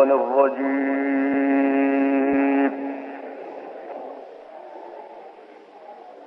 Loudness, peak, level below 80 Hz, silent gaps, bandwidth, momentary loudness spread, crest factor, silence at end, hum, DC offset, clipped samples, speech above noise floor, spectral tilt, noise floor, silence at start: -21 LUFS; -6 dBFS; -70 dBFS; none; 3.8 kHz; 22 LU; 18 dB; 0 s; none; under 0.1%; under 0.1%; 25 dB; -8 dB/octave; -45 dBFS; 0 s